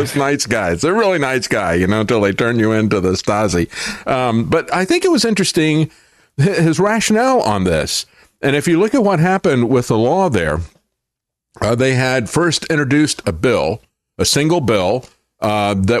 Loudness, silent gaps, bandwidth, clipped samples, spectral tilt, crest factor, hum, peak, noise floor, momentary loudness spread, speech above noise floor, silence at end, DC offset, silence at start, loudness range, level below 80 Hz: -15 LUFS; none; 13.5 kHz; under 0.1%; -5 dB/octave; 12 dB; none; -4 dBFS; -80 dBFS; 6 LU; 66 dB; 0 s; under 0.1%; 0 s; 2 LU; -42 dBFS